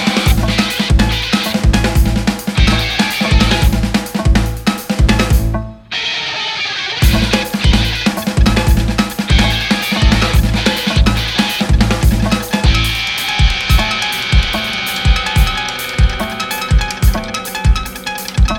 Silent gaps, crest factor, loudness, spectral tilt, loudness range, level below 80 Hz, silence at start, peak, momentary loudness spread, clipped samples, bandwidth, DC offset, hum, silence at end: none; 12 dB; -14 LUFS; -4.5 dB/octave; 2 LU; -16 dBFS; 0 s; 0 dBFS; 5 LU; under 0.1%; 18 kHz; under 0.1%; none; 0 s